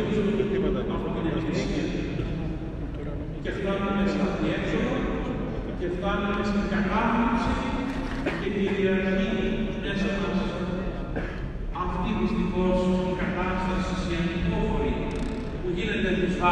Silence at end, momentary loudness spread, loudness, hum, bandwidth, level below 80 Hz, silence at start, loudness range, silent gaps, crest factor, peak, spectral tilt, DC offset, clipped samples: 0 s; 8 LU; -27 LUFS; none; 9.4 kHz; -36 dBFS; 0 s; 3 LU; none; 16 dB; -10 dBFS; -7 dB/octave; under 0.1%; under 0.1%